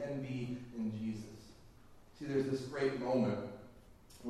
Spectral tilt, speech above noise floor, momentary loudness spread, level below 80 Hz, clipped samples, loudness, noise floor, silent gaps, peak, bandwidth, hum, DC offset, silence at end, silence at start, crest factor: -7 dB/octave; 24 dB; 20 LU; -66 dBFS; under 0.1%; -38 LUFS; -59 dBFS; none; -22 dBFS; 13 kHz; none; under 0.1%; 0 s; 0 s; 18 dB